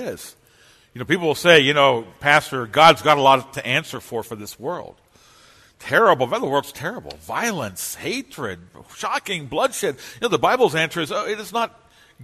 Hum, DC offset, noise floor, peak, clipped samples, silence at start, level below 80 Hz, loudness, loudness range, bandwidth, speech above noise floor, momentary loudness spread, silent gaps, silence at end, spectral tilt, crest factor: none; under 0.1%; -54 dBFS; 0 dBFS; under 0.1%; 0 s; -58 dBFS; -19 LUFS; 9 LU; 13.5 kHz; 34 dB; 17 LU; none; 0 s; -3.5 dB/octave; 20 dB